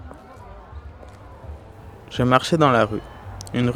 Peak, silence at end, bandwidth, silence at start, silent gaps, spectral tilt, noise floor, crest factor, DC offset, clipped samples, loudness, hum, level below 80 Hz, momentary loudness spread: 0 dBFS; 0 s; 15 kHz; 0 s; none; -6 dB/octave; -42 dBFS; 24 dB; under 0.1%; under 0.1%; -20 LUFS; none; -44 dBFS; 25 LU